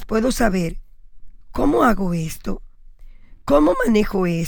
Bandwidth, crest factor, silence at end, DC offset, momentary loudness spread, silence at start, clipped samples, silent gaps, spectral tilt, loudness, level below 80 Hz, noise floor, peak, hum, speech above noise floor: over 20 kHz; 18 dB; 0 s; under 0.1%; 15 LU; 0 s; under 0.1%; none; -6 dB/octave; -19 LUFS; -30 dBFS; -40 dBFS; -2 dBFS; none; 22 dB